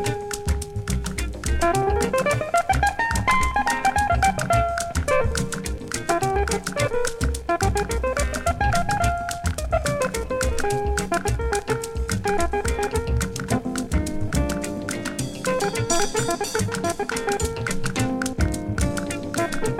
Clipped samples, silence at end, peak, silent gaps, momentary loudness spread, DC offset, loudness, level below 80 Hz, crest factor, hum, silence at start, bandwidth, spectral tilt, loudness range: under 0.1%; 0 s; -6 dBFS; none; 6 LU; under 0.1%; -24 LUFS; -30 dBFS; 16 dB; none; 0 s; 16.5 kHz; -4.5 dB/octave; 4 LU